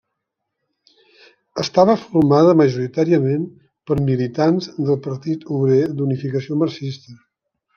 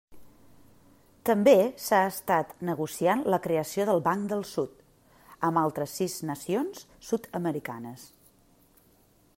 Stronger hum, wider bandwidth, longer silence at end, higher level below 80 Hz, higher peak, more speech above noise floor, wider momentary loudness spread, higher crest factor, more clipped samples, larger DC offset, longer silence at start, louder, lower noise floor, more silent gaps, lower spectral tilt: neither; second, 7 kHz vs 16 kHz; second, 0.6 s vs 1.3 s; first, -54 dBFS vs -66 dBFS; first, -2 dBFS vs -6 dBFS; first, 61 dB vs 35 dB; about the same, 12 LU vs 13 LU; second, 16 dB vs 22 dB; neither; neither; first, 1.55 s vs 0.1 s; first, -18 LUFS vs -28 LUFS; first, -78 dBFS vs -62 dBFS; neither; first, -8 dB/octave vs -5.5 dB/octave